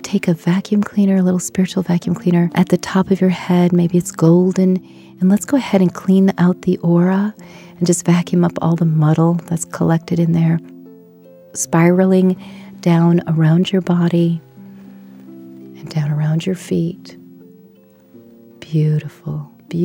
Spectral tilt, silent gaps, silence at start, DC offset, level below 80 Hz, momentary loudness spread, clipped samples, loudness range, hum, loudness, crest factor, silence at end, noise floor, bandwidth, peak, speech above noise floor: -7 dB/octave; none; 0.05 s; under 0.1%; -56 dBFS; 10 LU; under 0.1%; 8 LU; none; -16 LUFS; 16 dB; 0 s; -47 dBFS; 15 kHz; 0 dBFS; 32 dB